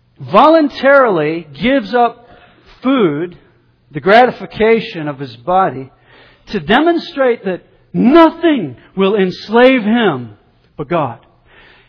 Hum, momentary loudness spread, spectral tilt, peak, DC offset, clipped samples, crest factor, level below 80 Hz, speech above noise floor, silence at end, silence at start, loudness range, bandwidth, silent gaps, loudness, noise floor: none; 15 LU; -8 dB/octave; 0 dBFS; under 0.1%; 0.2%; 14 dB; -46 dBFS; 37 dB; 0.7 s; 0.2 s; 3 LU; 5.4 kHz; none; -13 LUFS; -49 dBFS